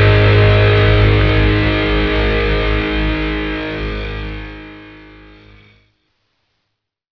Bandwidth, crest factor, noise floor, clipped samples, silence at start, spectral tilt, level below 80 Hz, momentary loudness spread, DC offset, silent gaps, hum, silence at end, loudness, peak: 5.4 kHz; 16 dB; -74 dBFS; under 0.1%; 0 s; -8 dB/octave; -22 dBFS; 16 LU; under 0.1%; none; none; 2.15 s; -14 LUFS; 0 dBFS